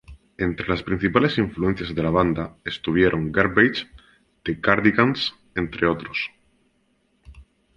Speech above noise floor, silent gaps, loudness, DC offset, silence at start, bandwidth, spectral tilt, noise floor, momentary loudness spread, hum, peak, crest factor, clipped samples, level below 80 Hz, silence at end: 44 dB; none; -22 LUFS; under 0.1%; 0.1 s; 9 kHz; -7.5 dB/octave; -66 dBFS; 11 LU; none; -2 dBFS; 22 dB; under 0.1%; -44 dBFS; 0.35 s